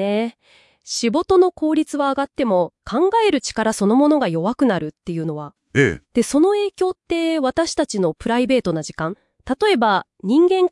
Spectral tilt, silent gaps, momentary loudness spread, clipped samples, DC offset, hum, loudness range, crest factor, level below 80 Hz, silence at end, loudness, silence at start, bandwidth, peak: -5 dB/octave; none; 11 LU; under 0.1%; under 0.1%; none; 2 LU; 16 dB; -52 dBFS; 0.05 s; -19 LUFS; 0 s; 12 kHz; -2 dBFS